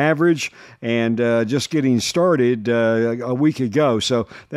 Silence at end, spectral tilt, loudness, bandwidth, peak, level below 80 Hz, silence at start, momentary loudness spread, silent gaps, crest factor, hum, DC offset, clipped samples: 0 s; -5.5 dB/octave; -19 LUFS; 14.5 kHz; -4 dBFS; -60 dBFS; 0 s; 6 LU; none; 14 dB; none; under 0.1%; under 0.1%